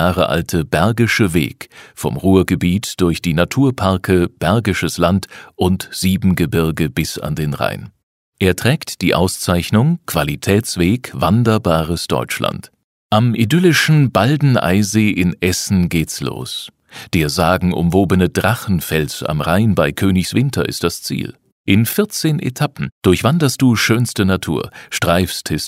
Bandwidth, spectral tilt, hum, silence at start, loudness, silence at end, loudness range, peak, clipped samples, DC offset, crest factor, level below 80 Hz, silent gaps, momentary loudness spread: 16 kHz; -5.5 dB/octave; none; 0 s; -16 LUFS; 0 s; 3 LU; 0 dBFS; under 0.1%; under 0.1%; 16 dB; -38 dBFS; 8.03-8.32 s, 12.84-13.10 s, 21.52-21.64 s, 22.92-23.01 s; 8 LU